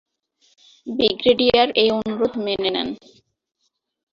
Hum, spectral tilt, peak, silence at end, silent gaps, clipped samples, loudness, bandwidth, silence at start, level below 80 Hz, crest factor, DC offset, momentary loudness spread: none; -5.5 dB/octave; -2 dBFS; 1.15 s; none; under 0.1%; -19 LUFS; 7 kHz; 0.85 s; -54 dBFS; 20 dB; under 0.1%; 14 LU